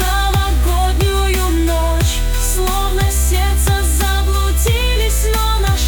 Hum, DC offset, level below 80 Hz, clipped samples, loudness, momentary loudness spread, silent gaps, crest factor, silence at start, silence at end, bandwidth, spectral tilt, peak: none; under 0.1%; -16 dBFS; under 0.1%; -16 LUFS; 2 LU; none; 10 dB; 0 s; 0 s; 19.5 kHz; -4 dB/octave; -4 dBFS